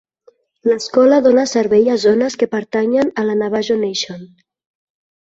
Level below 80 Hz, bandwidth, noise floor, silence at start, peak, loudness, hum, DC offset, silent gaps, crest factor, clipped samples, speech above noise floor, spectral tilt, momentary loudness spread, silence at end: -60 dBFS; 8 kHz; -53 dBFS; 0.65 s; -2 dBFS; -15 LUFS; none; under 0.1%; none; 14 dB; under 0.1%; 39 dB; -4.5 dB/octave; 9 LU; 0.95 s